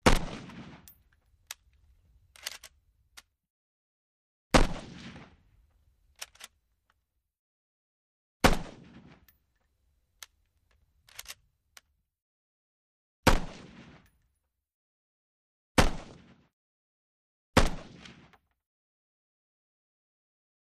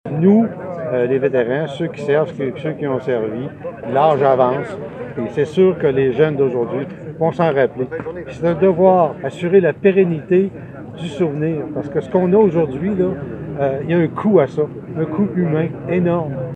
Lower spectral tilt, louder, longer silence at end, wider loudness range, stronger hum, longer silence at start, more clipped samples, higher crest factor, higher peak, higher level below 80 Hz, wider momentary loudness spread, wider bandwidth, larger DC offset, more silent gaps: second, -4.5 dB/octave vs -9 dB/octave; second, -29 LUFS vs -17 LUFS; first, 2.8 s vs 0 s; first, 19 LU vs 3 LU; neither; about the same, 0.05 s vs 0.05 s; neither; first, 28 dB vs 16 dB; second, -6 dBFS vs 0 dBFS; first, -38 dBFS vs -50 dBFS; first, 25 LU vs 12 LU; first, 15 kHz vs 8.6 kHz; neither; first, 3.50-4.50 s, 7.39-8.40 s, 12.22-13.23 s, 14.74-15.75 s, 16.53-17.53 s vs none